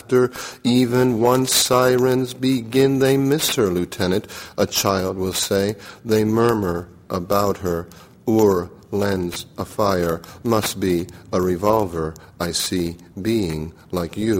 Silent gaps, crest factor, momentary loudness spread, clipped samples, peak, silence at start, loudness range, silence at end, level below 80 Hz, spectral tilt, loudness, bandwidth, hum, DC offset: none; 16 dB; 12 LU; under 0.1%; -4 dBFS; 0.1 s; 5 LU; 0 s; -48 dBFS; -4.5 dB/octave; -20 LUFS; 16.5 kHz; none; under 0.1%